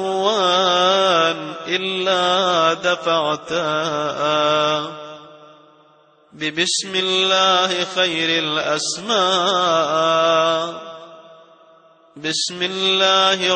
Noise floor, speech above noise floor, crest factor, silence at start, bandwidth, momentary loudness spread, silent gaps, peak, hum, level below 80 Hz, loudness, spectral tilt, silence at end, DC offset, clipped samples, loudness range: -53 dBFS; 35 dB; 16 dB; 0 s; 9 kHz; 9 LU; none; -2 dBFS; none; -68 dBFS; -17 LUFS; -2.5 dB/octave; 0 s; under 0.1%; under 0.1%; 4 LU